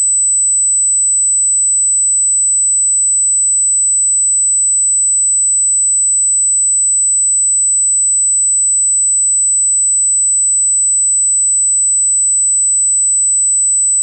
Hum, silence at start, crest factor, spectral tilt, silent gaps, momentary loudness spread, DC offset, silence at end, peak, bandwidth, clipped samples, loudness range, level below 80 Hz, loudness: none; 0 s; 4 dB; 8.5 dB/octave; none; 0 LU; under 0.1%; 0 s; -8 dBFS; 12 kHz; under 0.1%; 0 LU; under -90 dBFS; -9 LUFS